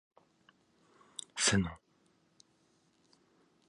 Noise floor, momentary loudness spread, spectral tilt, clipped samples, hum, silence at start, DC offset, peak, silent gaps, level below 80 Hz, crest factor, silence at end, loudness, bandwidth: -72 dBFS; 20 LU; -3 dB/octave; under 0.1%; none; 1.35 s; under 0.1%; -16 dBFS; none; -60 dBFS; 24 dB; 1.95 s; -32 LUFS; 11 kHz